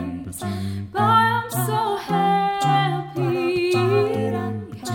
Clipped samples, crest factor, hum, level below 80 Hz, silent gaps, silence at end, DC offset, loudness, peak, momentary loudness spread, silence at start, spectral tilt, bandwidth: under 0.1%; 16 dB; none; -56 dBFS; none; 0 s; under 0.1%; -21 LUFS; -4 dBFS; 11 LU; 0 s; -5.5 dB/octave; 19 kHz